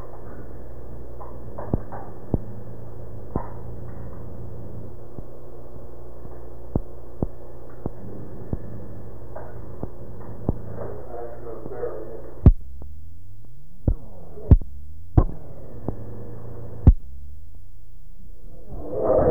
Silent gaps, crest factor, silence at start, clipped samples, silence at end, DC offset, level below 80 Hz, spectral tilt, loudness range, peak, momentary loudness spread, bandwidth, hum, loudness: none; 24 dB; 0 s; under 0.1%; 0 s; 5%; -30 dBFS; -11.5 dB/octave; 13 LU; -4 dBFS; 23 LU; 2.6 kHz; none; -28 LUFS